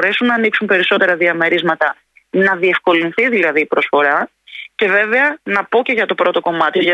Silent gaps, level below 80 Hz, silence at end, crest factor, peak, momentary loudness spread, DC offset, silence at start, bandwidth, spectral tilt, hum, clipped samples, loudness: none; -66 dBFS; 0 s; 14 dB; -2 dBFS; 6 LU; under 0.1%; 0 s; 9.2 kHz; -6 dB/octave; none; under 0.1%; -14 LUFS